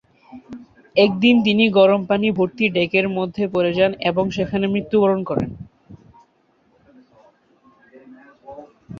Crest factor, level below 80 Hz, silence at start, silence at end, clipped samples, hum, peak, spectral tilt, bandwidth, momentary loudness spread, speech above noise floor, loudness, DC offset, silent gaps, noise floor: 18 dB; -54 dBFS; 0.35 s; 0 s; under 0.1%; none; -2 dBFS; -7 dB/octave; 7 kHz; 25 LU; 43 dB; -18 LUFS; under 0.1%; none; -61 dBFS